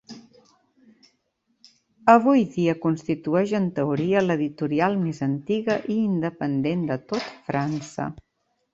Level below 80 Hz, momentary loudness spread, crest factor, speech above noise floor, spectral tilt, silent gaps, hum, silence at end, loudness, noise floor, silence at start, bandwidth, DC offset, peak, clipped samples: -62 dBFS; 11 LU; 22 dB; 49 dB; -7.5 dB/octave; none; none; 0.55 s; -23 LUFS; -72 dBFS; 0.1 s; 8 kHz; under 0.1%; -2 dBFS; under 0.1%